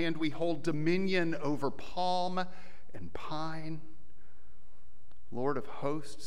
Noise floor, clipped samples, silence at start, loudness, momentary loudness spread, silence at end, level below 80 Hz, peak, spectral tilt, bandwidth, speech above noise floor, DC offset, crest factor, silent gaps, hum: -62 dBFS; under 0.1%; 0 s; -35 LUFS; 15 LU; 0 s; -62 dBFS; -16 dBFS; -6 dB/octave; 12.5 kHz; 28 dB; 3%; 18 dB; none; none